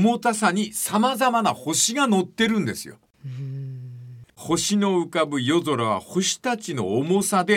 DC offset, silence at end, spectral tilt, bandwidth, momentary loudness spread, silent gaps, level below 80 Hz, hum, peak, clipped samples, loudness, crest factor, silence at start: under 0.1%; 0 s; -4 dB/octave; 17 kHz; 16 LU; none; -62 dBFS; none; -6 dBFS; under 0.1%; -22 LUFS; 18 dB; 0 s